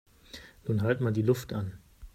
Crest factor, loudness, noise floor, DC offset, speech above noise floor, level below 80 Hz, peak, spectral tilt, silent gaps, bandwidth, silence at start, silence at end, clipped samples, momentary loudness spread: 18 dB; -30 LUFS; -51 dBFS; under 0.1%; 22 dB; -56 dBFS; -14 dBFS; -7.5 dB/octave; none; 15 kHz; 0.35 s; 0.05 s; under 0.1%; 20 LU